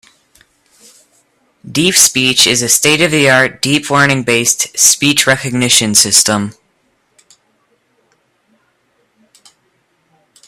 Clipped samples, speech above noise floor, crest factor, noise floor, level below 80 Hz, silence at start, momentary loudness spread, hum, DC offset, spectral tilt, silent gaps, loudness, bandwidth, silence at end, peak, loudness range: 0.2%; 48 dB; 14 dB; -59 dBFS; -52 dBFS; 1.65 s; 6 LU; none; under 0.1%; -2 dB/octave; none; -9 LUFS; over 20 kHz; 3.95 s; 0 dBFS; 4 LU